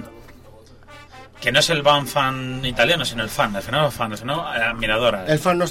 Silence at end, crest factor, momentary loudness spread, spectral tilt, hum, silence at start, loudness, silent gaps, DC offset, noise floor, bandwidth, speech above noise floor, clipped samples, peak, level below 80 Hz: 0 s; 18 dB; 8 LU; -4 dB/octave; none; 0 s; -20 LUFS; none; 0.2%; -45 dBFS; 16.5 kHz; 25 dB; under 0.1%; -2 dBFS; -42 dBFS